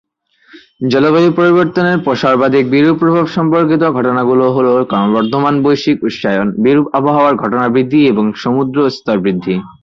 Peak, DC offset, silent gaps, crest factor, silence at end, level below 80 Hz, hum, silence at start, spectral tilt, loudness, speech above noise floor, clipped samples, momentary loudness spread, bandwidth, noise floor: -2 dBFS; under 0.1%; none; 10 dB; 0.1 s; -52 dBFS; none; 0.55 s; -7.5 dB/octave; -12 LUFS; 37 dB; under 0.1%; 5 LU; 7.2 kHz; -48 dBFS